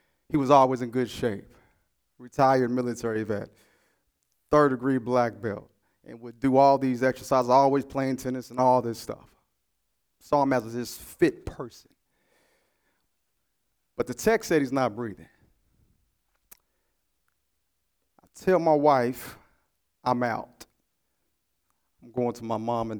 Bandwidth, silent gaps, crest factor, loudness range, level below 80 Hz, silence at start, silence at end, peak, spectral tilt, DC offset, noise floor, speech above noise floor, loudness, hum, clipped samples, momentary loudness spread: over 20 kHz; none; 22 dB; 9 LU; -58 dBFS; 0.3 s; 0 s; -4 dBFS; -6 dB/octave; under 0.1%; -78 dBFS; 53 dB; -25 LUFS; none; under 0.1%; 18 LU